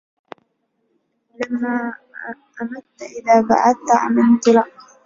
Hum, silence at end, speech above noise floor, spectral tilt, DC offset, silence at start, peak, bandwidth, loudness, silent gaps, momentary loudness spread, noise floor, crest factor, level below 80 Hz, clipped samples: none; 0.35 s; 52 dB; -5 dB/octave; under 0.1%; 1.4 s; -2 dBFS; 7.6 kHz; -16 LUFS; none; 19 LU; -69 dBFS; 18 dB; -62 dBFS; under 0.1%